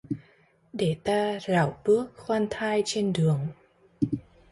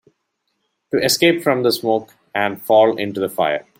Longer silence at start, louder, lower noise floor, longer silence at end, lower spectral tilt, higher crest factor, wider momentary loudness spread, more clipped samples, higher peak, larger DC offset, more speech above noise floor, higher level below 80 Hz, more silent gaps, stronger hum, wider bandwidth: second, 0.1 s vs 0.95 s; second, -27 LUFS vs -17 LUFS; second, -61 dBFS vs -72 dBFS; about the same, 0.3 s vs 0.2 s; first, -6 dB/octave vs -3.5 dB/octave; about the same, 16 dB vs 16 dB; first, 11 LU vs 8 LU; neither; second, -12 dBFS vs -2 dBFS; neither; second, 36 dB vs 55 dB; about the same, -58 dBFS vs -62 dBFS; neither; neither; second, 11.5 kHz vs 16.5 kHz